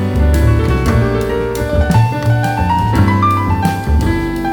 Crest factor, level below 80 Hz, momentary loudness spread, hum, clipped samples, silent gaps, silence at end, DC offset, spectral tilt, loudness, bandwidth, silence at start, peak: 12 dB; -20 dBFS; 4 LU; none; under 0.1%; none; 0 s; under 0.1%; -7 dB/octave; -14 LUFS; 18.5 kHz; 0 s; 0 dBFS